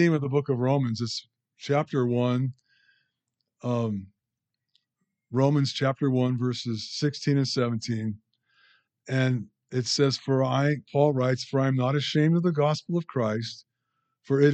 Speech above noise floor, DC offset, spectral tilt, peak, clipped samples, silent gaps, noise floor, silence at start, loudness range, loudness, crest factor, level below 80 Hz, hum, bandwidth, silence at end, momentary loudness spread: 60 dB; under 0.1%; -6.5 dB/octave; -8 dBFS; under 0.1%; none; -85 dBFS; 0 s; 5 LU; -26 LUFS; 18 dB; -72 dBFS; none; 8.6 kHz; 0 s; 9 LU